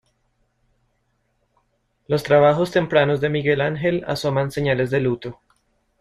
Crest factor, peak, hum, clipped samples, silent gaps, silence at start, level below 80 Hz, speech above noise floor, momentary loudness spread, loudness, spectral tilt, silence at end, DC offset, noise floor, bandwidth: 20 dB; -2 dBFS; none; under 0.1%; none; 2.1 s; -52 dBFS; 49 dB; 9 LU; -20 LUFS; -6.5 dB/octave; 0.7 s; under 0.1%; -68 dBFS; 13 kHz